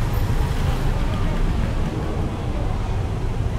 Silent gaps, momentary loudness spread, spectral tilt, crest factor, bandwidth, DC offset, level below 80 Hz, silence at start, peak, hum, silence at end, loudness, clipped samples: none; 3 LU; -7 dB/octave; 12 dB; 15 kHz; under 0.1%; -24 dBFS; 0 s; -8 dBFS; none; 0 s; -25 LUFS; under 0.1%